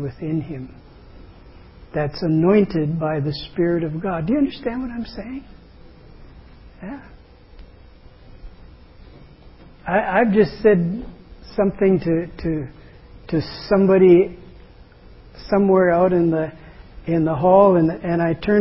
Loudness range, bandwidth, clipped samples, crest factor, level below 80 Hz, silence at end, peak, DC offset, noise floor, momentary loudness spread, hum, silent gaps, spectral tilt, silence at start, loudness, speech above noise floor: 10 LU; 5.8 kHz; under 0.1%; 18 dB; -44 dBFS; 0 s; -2 dBFS; under 0.1%; -45 dBFS; 21 LU; none; none; -12 dB/octave; 0 s; -19 LUFS; 27 dB